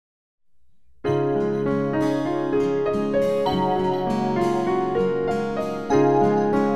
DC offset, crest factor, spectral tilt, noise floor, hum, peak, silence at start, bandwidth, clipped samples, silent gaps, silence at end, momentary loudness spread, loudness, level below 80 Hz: 0.7%; 14 dB; -7.5 dB/octave; -64 dBFS; none; -8 dBFS; 0.4 s; 13 kHz; under 0.1%; none; 0 s; 5 LU; -22 LUFS; -50 dBFS